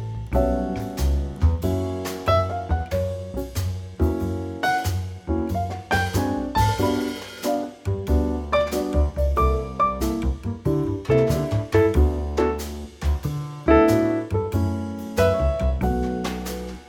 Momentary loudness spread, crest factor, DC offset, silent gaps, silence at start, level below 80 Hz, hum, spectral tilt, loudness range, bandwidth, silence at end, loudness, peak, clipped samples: 9 LU; 18 dB; under 0.1%; none; 0 s; -28 dBFS; none; -6.5 dB/octave; 4 LU; 19.5 kHz; 0 s; -23 LUFS; -4 dBFS; under 0.1%